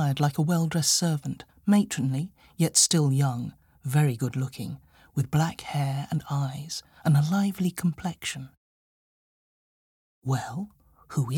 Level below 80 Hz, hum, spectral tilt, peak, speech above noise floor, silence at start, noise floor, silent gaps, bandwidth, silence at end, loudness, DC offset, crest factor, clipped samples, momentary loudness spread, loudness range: -60 dBFS; none; -4.5 dB/octave; -8 dBFS; over 64 dB; 0 s; under -90 dBFS; 8.57-10.22 s; 18 kHz; 0 s; -26 LUFS; under 0.1%; 20 dB; under 0.1%; 15 LU; 9 LU